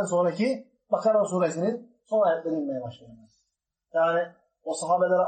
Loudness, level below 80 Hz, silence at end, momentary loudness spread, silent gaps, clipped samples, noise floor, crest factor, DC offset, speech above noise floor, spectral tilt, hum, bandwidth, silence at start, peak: -26 LUFS; -78 dBFS; 0 s; 12 LU; none; under 0.1%; -80 dBFS; 16 dB; under 0.1%; 55 dB; -5.5 dB/octave; none; 8.8 kHz; 0 s; -10 dBFS